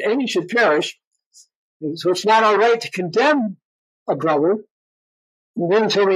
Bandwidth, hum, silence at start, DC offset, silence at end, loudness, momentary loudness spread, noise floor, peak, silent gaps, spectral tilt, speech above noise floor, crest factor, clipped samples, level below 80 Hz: 14 kHz; none; 0 s; under 0.1%; 0 s; -18 LUFS; 13 LU; under -90 dBFS; -6 dBFS; 1.07-1.11 s, 1.26-1.31 s, 1.56-1.80 s, 3.65-4.06 s, 4.71-5.54 s; -4.5 dB/octave; over 73 dB; 14 dB; under 0.1%; -78 dBFS